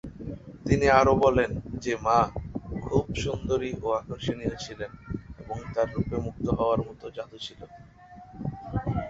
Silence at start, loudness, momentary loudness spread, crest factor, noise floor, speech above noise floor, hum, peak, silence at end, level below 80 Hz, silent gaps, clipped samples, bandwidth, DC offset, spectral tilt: 0.05 s; -27 LUFS; 18 LU; 24 dB; -49 dBFS; 23 dB; none; -4 dBFS; 0 s; -42 dBFS; none; under 0.1%; 8 kHz; under 0.1%; -6.5 dB/octave